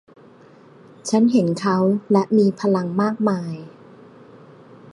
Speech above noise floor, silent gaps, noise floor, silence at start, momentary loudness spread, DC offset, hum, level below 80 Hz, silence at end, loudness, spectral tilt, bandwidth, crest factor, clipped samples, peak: 29 dB; none; -48 dBFS; 1.05 s; 11 LU; under 0.1%; none; -68 dBFS; 1.25 s; -19 LUFS; -7 dB/octave; 11.5 kHz; 18 dB; under 0.1%; -4 dBFS